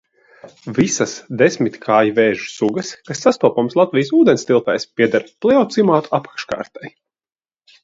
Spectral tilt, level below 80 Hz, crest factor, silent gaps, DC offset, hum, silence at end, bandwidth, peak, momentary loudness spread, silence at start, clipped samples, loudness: -5 dB/octave; -60 dBFS; 16 dB; none; under 0.1%; none; 0.95 s; 8 kHz; 0 dBFS; 13 LU; 0.45 s; under 0.1%; -17 LUFS